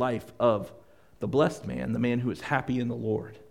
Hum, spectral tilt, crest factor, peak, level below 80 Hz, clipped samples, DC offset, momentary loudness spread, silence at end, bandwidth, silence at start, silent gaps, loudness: none; -7 dB/octave; 20 dB; -10 dBFS; -56 dBFS; under 0.1%; 0.1%; 8 LU; 0.1 s; 15 kHz; 0 s; none; -29 LUFS